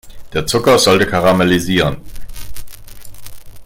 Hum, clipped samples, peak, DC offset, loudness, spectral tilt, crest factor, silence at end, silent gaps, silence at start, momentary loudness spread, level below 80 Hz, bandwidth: none; under 0.1%; 0 dBFS; under 0.1%; -13 LUFS; -4.5 dB/octave; 14 dB; 0 s; none; 0.05 s; 23 LU; -34 dBFS; 17 kHz